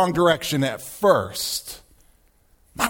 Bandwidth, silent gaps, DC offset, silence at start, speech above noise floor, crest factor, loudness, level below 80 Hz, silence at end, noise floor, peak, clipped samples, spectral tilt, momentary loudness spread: over 20 kHz; none; under 0.1%; 0 s; 37 dB; 20 dB; -22 LUFS; -52 dBFS; 0 s; -59 dBFS; -2 dBFS; under 0.1%; -4 dB/octave; 19 LU